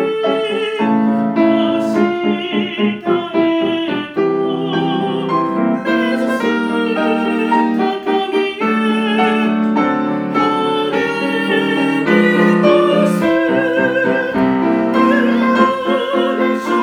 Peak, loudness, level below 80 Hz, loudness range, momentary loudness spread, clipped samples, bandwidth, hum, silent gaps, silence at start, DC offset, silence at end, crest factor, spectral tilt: 0 dBFS; -15 LUFS; -58 dBFS; 3 LU; 5 LU; under 0.1%; 12.5 kHz; none; none; 0 s; under 0.1%; 0 s; 14 dB; -6.5 dB/octave